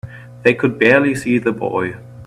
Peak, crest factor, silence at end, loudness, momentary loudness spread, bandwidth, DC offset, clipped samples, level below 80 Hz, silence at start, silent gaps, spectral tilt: 0 dBFS; 16 dB; 0 s; -16 LUFS; 11 LU; 14 kHz; under 0.1%; under 0.1%; -52 dBFS; 0.05 s; none; -6.5 dB/octave